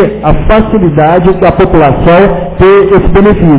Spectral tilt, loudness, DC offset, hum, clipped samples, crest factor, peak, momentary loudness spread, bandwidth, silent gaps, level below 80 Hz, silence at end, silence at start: -11.5 dB/octave; -6 LUFS; under 0.1%; none; 5%; 4 dB; 0 dBFS; 3 LU; 4 kHz; none; -16 dBFS; 0 s; 0 s